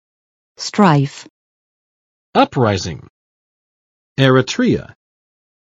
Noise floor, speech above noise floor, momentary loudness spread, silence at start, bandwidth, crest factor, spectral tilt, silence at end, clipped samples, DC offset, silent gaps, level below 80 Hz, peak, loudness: under -90 dBFS; over 75 dB; 15 LU; 0.6 s; 8 kHz; 18 dB; -6 dB/octave; 0.9 s; under 0.1%; under 0.1%; 1.30-2.33 s, 3.10-4.16 s; -54 dBFS; 0 dBFS; -15 LUFS